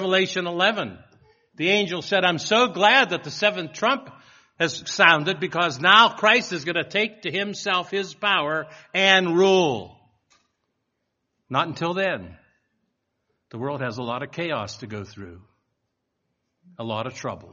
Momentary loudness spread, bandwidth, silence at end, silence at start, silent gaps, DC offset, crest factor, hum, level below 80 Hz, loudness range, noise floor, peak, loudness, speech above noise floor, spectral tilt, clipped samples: 15 LU; 7.4 kHz; 0.05 s; 0 s; none; under 0.1%; 24 dB; none; -66 dBFS; 13 LU; -77 dBFS; 0 dBFS; -21 LUFS; 55 dB; -1.5 dB/octave; under 0.1%